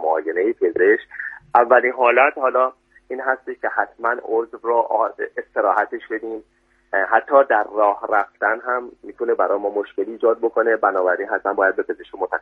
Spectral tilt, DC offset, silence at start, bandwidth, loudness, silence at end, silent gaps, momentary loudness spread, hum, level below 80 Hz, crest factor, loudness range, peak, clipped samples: -6 dB/octave; under 0.1%; 0 s; 4 kHz; -19 LUFS; 0 s; none; 12 LU; none; -66 dBFS; 20 dB; 4 LU; 0 dBFS; under 0.1%